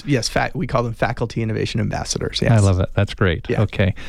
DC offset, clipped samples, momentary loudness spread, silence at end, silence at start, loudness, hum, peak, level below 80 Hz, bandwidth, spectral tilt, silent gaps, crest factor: under 0.1%; under 0.1%; 7 LU; 0 s; 0 s; -20 LUFS; none; -4 dBFS; -34 dBFS; 13 kHz; -5.5 dB/octave; none; 14 dB